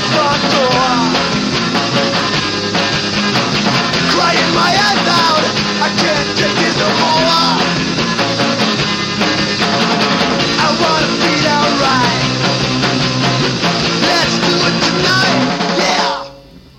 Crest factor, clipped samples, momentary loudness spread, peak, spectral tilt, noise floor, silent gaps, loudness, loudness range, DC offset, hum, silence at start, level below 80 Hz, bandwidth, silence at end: 12 dB; under 0.1%; 3 LU; 0 dBFS; -3.5 dB/octave; -37 dBFS; none; -12 LUFS; 1 LU; under 0.1%; none; 0 s; -42 dBFS; 16 kHz; 0.2 s